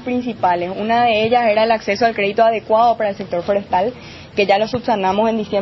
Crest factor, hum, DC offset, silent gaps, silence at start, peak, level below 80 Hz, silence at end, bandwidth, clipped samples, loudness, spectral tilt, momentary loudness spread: 14 dB; none; under 0.1%; none; 0 s; -2 dBFS; -52 dBFS; 0 s; 6.2 kHz; under 0.1%; -17 LUFS; -6 dB/octave; 6 LU